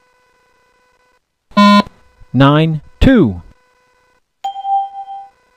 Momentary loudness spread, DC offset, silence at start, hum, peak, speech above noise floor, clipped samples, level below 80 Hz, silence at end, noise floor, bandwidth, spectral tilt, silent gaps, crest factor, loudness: 20 LU; under 0.1%; 1.55 s; none; 0 dBFS; 49 dB; 0.2%; -30 dBFS; 0.35 s; -59 dBFS; 10 kHz; -7 dB/octave; none; 16 dB; -13 LUFS